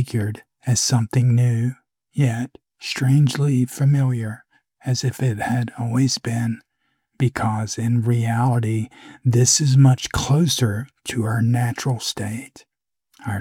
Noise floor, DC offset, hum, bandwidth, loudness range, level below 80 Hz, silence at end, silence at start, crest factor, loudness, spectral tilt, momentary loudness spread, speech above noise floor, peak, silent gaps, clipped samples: -71 dBFS; under 0.1%; none; 16 kHz; 4 LU; -50 dBFS; 0 s; 0 s; 16 dB; -20 LUFS; -5 dB/octave; 13 LU; 52 dB; -4 dBFS; none; under 0.1%